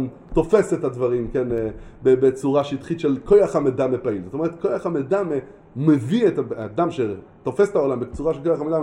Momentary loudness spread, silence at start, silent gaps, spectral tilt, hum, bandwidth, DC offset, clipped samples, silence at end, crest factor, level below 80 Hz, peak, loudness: 9 LU; 0 s; none; -7.5 dB/octave; none; 11 kHz; under 0.1%; under 0.1%; 0 s; 18 dB; -44 dBFS; -4 dBFS; -21 LUFS